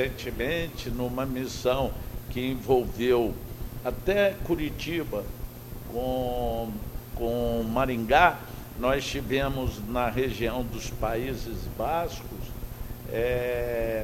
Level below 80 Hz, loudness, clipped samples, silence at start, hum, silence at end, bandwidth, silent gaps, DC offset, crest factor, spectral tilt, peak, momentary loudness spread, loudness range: -38 dBFS; -28 LUFS; under 0.1%; 0 s; none; 0 s; 16.5 kHz; none; under 0.1%; 24 dB; -5.5 dB/octave; -4 dBFS; 14 LU; 5 LU